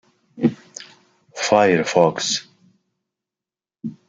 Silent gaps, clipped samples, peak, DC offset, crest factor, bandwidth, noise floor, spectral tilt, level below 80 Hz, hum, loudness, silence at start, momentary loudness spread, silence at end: none; under 0.1%; -2 dBFS; under 0.1%; 20 dB; 9.4 kHz; under -90 dBFS; -4 dB/octave; -66 dBFS; none; -19 LUFS; 0.35 s; 22 LU; 0.15 s